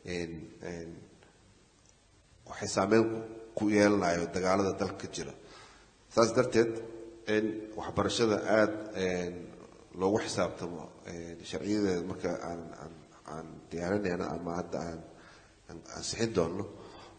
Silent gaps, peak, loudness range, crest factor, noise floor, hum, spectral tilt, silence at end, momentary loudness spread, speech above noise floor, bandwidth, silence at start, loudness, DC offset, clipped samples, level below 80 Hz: none; -10 dBFS; 7 LU; 24 dB; -63 dBFS; none; -5 dB/octave; 0 s; 20 LU; 32 dB; 9.4 kHz; 0.05 s; -32 LUFS; under 0.1%; under 0.1%; -62 dBFS